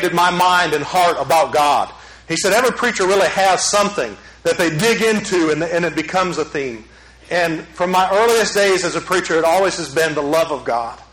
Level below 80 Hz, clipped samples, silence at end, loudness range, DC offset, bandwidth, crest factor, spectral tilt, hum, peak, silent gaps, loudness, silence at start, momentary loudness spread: -48 dBFS; under 0.1%; 0.1 s; 3 LU; under 0.1%; 16.5 kHz; 14 dB; -3 dB/octave; none; -4 dBFS; none; -16 LUFS; 0 s; 8 LU